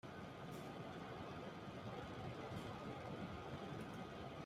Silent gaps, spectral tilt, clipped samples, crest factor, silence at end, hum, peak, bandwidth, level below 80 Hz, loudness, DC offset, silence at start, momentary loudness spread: none; -6 dB/octave; under 0.1%; 14 dB; 0 s; none; -38 dBFS; 15.5 kHz; -70 dBFS; -51 LUFS; under 0.1%; 0.05 s; 2 LU